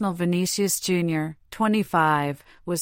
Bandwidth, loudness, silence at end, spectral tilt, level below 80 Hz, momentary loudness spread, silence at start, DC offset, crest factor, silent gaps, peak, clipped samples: 16.5 kHz; -24 LUFS; 0 s; -4.5 dB/octave; -58 dBFS; 10 LU; 0 s; under 0.1%; 16 dB; none; -8 dBFS; under 0.1%